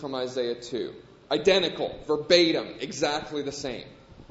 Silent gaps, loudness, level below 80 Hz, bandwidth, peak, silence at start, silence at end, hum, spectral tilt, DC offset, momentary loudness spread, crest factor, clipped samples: none; -26 LUFS; -58 dBFS; 8 kHz; -4 dBFS; 0 s; 0.05 s; none; -3.5 dB/octave; under 0.1%; 14 LU; 22 dB; under 0.1%